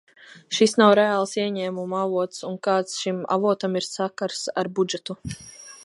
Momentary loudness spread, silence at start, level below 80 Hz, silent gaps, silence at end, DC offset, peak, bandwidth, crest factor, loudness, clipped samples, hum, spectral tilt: 14 LU; 0.35 s; -60 dBFS; none; 0 s; under 0.1%; -2 dBFS; 11.5 kHz; 22 dB; -23 LUFS; under 0.1%; none; -4.5 dB/octave